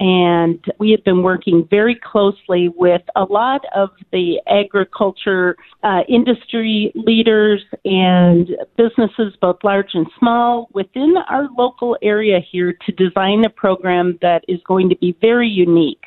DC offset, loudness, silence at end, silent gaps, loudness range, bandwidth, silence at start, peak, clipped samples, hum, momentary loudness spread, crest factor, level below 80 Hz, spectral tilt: under 0.1%; -15 LUFS; 0.15 s; none; 2 LU; 4.2 kHz; 0 s; 0 dBFS; under 0.1%; none; 6 LU; 14 dB; -56 dBFS; -10 dB/octave